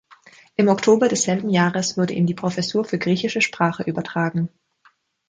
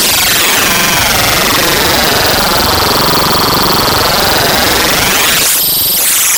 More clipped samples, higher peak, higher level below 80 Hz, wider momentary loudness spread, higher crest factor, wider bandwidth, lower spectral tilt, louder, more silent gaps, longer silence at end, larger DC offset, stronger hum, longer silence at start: neither; second, -4 dBFS vs 0 dBFS; second, -62 dBFS vs -30 dBFS; first, 8 LU vs 1 LU; first, 18 dB vs 10 dB; second, 9.6 kHz vs 19.5 kHz; first, -5 dB/octave vs -1.5 dB/octave; second, -21 LUFS vs -7 LUFS; neither; first, 0.8 s vs 0 s; neither; neither; first, 0.6 s vs 0 s